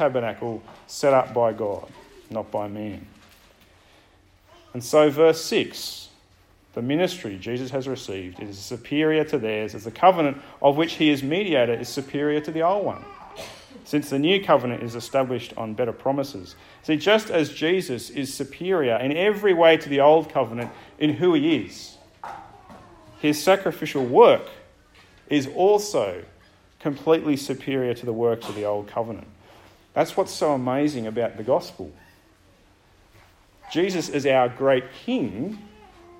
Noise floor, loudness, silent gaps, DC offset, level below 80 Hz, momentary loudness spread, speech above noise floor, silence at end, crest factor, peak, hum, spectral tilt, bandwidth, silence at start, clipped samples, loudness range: -57 dBFS; -23 LUFS; none; under 0.1%; -60 dBFS; 18 LU; 34 dB; 0.5 s; 22 dB; -2 dBFS; none; -5 dB/octave; 16.5 kHz; 0 s; under 0.1%; 6 LU